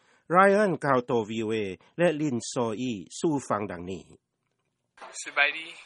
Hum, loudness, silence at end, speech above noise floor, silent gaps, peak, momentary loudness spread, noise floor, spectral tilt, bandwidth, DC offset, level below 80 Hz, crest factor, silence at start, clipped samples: none; -26 LUFS; 0 s; 51 dB; none; -6 dBFS; 16 LU; -78 dBFS; -5 dB/octave; 11 kHz; under 0.1%; -68 dBFS; 22 dB; 0.3 s; under 0.1%